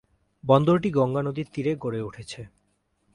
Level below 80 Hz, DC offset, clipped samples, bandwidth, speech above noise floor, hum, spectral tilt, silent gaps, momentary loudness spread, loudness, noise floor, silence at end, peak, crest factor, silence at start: -58 dBFS; under 0.1%; under 0.1%; 11 kHz; 46 dB; none; -8 dB/octave; none; 19 LU; -24 LUFS; -70 dBFS; 0.7 s; -4 dBFS; 22 dB; 0.45 s